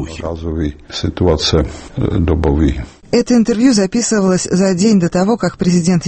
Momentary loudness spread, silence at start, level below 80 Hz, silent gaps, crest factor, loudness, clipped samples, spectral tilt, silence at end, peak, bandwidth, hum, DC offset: 10 LU; 0 s; -26 dBFS; none; 14 dB; -14 LUFS; under 0.1%; -5.5 dB/octave; 0 s; 0 dBFS; 8.8 kHz; none; under 0.1%